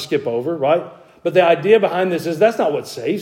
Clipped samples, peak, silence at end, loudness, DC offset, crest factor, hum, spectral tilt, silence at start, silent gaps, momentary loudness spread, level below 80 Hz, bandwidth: under 0.1%; 0 dBFS; 0 s; -17 LUFS; under 0.1%; 16 dB; none; -5.5 dB/octave; 0 s; none; 9 LU; -68 dBFS; 16.5 kHz